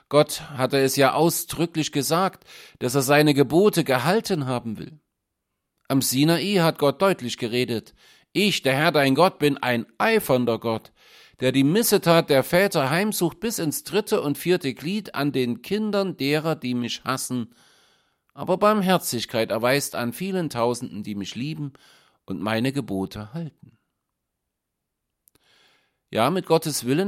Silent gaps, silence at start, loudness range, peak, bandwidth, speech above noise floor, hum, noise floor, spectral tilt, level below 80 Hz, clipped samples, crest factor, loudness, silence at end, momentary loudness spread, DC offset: none; 0.1 s; 9 LU; -4 dBFS; 16.5 kHz; 59 dB; none; -81 dBFS; -4.5 dB/octave; -60 dBFS; under 0.1%; 20 dB; -22 LUFS; 0 s; 12 LU; under 0.1%